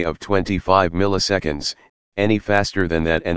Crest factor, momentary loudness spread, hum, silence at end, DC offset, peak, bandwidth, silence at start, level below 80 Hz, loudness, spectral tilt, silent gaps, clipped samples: 20 dB; 9 LU; none; 0 s; 2%; 0 dBFS; 9.8 kHz; 0 s; -38 dBFS; -19 LUFS; -5 dB/octave; 1.89-2.12 s; under 0.1%